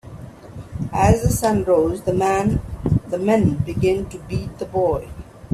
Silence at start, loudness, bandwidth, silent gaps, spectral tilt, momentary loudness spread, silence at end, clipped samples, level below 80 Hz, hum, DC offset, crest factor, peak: 0.05 s; -20 LUFS; 15 kHz; none; -7 dB/octave; 20 LU; 0 s; under 0.1%; -34 dBFS; none; under 0.1%; 18 dB; -2 dBFS